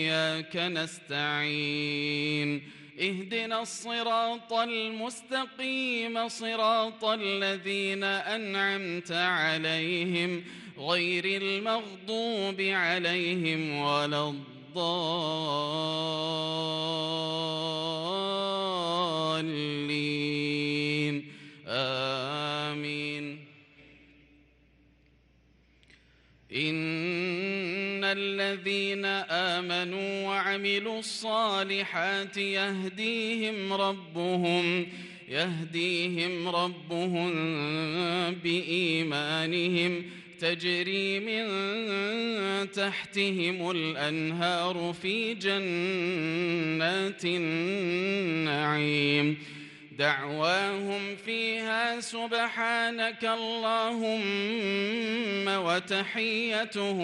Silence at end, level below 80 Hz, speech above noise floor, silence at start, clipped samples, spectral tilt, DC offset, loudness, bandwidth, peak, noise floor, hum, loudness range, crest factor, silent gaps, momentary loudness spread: 0 s; -76 dBFS; 33 dB; 0 s; under 0.1%; -4.5 dB/octave; under 0.1%; -29 LUFS; 12 kHz; -12 dBFS; -63 dBFS; none; 3 LU; 18 dB; none; 5 LU